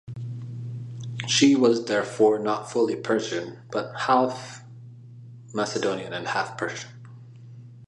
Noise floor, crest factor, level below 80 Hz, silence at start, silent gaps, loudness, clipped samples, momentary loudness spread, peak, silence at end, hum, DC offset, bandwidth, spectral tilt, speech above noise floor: -44 dBFS; 20 dB; -68 dBFS; 0.05 s; none; -25 LUFS; under 0.1%; 25 LU; -6 dBFS; 0 s; none; under 0.1%; 11.5 kHz; -4.5 dB/octave; 21 dB